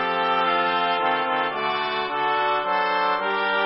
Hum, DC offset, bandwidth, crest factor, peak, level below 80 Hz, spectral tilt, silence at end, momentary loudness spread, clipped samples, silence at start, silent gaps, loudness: none; under 0.1%; 5.8 kHz; 14 dB; -8 dBFS; -70 dBFS; -8 dB/octave; 0 s; 3 LU; under 0.1%; 0 s; none; -22 LUFS